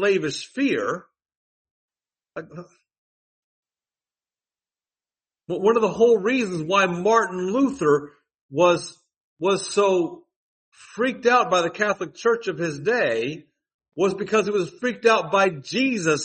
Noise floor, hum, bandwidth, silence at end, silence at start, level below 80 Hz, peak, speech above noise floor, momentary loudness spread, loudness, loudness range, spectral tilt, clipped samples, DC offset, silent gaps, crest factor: under -90 dBFS; none; 8.8 kHz; 0 s; 0 s; -68 dBFS; -4 dBFS; over 68 dB; 13 LU; -22 LUFS; 8 LU; -4.5 dB/octave; under 0.1%; under 0.1%; 1.37-1.65 s, 1.71-1.88 s, 2.98-3.63 s, 8.41-8.49 s, 9.17-9.37 s, 10.36-10.72 s, 13.74-13.79 s; 18 dB